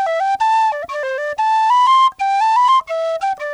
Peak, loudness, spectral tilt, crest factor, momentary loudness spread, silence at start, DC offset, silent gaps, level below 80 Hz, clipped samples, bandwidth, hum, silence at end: -6 dBFS; -15 LUFS; 0.5 dB/octave; 8 dB; 9 LU; 0 s; under 0.1%; none; -62 dBFS; under 0.1%; 10.5 kHz; none; 0 s